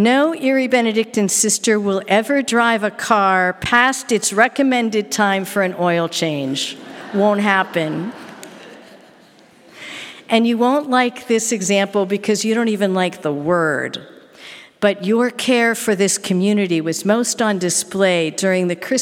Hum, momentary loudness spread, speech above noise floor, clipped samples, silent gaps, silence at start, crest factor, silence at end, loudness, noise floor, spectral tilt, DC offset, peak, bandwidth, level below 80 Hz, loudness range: none; 10 LU; 31 dB; under 0.1%; none; 0 s; 18 dB; 0 s; -17 LUFS; -48 dBFS; -3.5 dB/octave; under 0.1%; 0 dBFS; 17 kHz; -60 dBFS; 5 LU